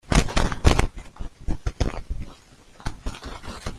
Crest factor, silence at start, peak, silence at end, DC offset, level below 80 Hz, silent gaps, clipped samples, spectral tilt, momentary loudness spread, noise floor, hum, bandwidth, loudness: 24 dB; 0.05 s; 0 dBFS; 0 s; under 0.1%; -28 dBFS; none; under 0.1%; -5 dB/octave; 16 LU; -49 dBFS; none; 14 kHz; -27 LUFS